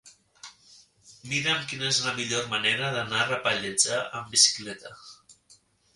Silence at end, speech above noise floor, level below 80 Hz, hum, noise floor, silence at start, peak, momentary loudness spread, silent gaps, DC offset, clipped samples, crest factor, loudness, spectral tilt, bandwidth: 0.4 s; 33 dB; -66 dBFS; none; -60 dBFS; 0.05 s; -6 dBFS; 16 LU; none; under 0.1%; under 0.1%; 24 dB; -25 LUFS; -1 dB/octave; 11.5 kHz